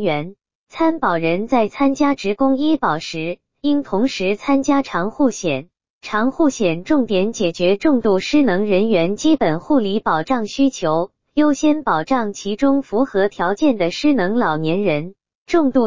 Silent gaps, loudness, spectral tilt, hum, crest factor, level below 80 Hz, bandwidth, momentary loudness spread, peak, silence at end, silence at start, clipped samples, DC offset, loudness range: 0.55-0.67 s, 5.90-6.01 s, 15.35-15.46 s; -18 LUFS; -5.5 dB/octave; none; 14 dB; -52 dBFS; 7.6 kHz; 7 LU; -4 dBFS; 0 s; 0 s; under 0.1%; 2%; 2 LU